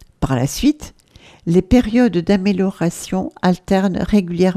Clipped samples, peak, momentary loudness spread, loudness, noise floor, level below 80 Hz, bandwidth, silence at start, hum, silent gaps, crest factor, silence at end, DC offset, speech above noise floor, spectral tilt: under 0.1%; 0 dBFS; 8 LU; -17 LUFS; -46 dBFS; -34 dBFS; 15 kHz; 0.2 s; none; none; 16 dB; 0 s; under 0.1%; 30 dB; -6.5 dB/octave